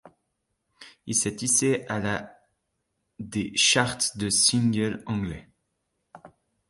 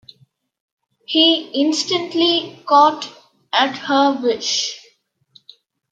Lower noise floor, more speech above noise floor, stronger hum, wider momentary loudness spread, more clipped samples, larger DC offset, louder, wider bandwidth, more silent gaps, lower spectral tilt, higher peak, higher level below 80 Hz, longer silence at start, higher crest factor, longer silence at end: first, -78 dBFS vs -58 dBFS; first, 53 dB vs 42 dB; neither; first, 14 LU vs 9 LU; neither; neither; second, -24 LUFS vs -17 LUFS; first, 12 kHz vs 9.2 kHz; neither; about the same, -2.5 dB/octave vs -2 dB/octave; second, -6 dBFS vs -2 dBFS; first, -56 dBFS vs -74 dBFS; second, 0.05 s vs 1.1 s; about the same, 22 dB vs 18 dB; second, 0.4 s vs 1.15 s